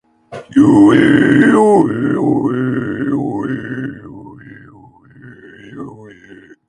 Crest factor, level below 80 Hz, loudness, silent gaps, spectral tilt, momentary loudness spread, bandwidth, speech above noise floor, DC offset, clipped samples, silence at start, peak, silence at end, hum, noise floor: 14 dB; -50 dBFS; -12 LUFS; none; -7.5 dB/octave; 24 LU; 9.8 kHz; 33 dB; under 0.1%; under 0.1%; 0.3 s; 0 dBFS; 0.6 s; none; -43 dBFS